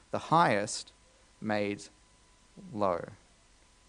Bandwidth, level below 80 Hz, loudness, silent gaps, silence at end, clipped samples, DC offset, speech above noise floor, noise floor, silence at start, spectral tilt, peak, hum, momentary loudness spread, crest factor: 10 kHz; -66 dBFS; -31 LUFS; none; 0.75 s; under 0.1%; under 0.1%; 32 dB; -62 dBFS; 0.15 s; -4.5 dB/octave; -10 dBFS; none; 21 LU; 22 dB